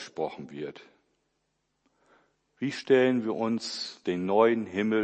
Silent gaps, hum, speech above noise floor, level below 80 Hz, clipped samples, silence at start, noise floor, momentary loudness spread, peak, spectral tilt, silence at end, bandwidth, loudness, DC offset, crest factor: none; none; 50 dB; -76 dBFS; under 0.1%; 0 s; -77 dBFS; 16 LU; -8 dBFS; -5.5 dB/octave; 0 s; 8.8 kHz; -27 LUFS; under 0.1%; 20 dB